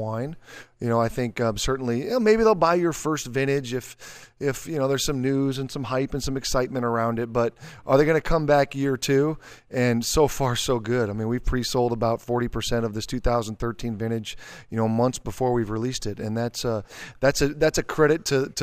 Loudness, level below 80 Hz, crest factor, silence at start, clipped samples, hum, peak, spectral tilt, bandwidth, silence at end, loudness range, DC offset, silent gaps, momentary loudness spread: -24 LUFS; -38 dBFS; 18 dB; 0 s; under 0.1%; none; -6 dBFS; -5 dB/octave; 15.5 kHz; 0 s; 4 LU; under 0.1%; none; 10 LU